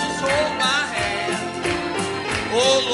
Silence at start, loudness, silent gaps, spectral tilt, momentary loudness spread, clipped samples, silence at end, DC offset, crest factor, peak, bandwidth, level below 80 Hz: 0 s; -21 LUFS; none; -3 dB/octave; 6 LU; under 0.1%; 0 s; under 0.1%; 16 dB; -6 dBFS; 11.5 kHz; -48 dBFS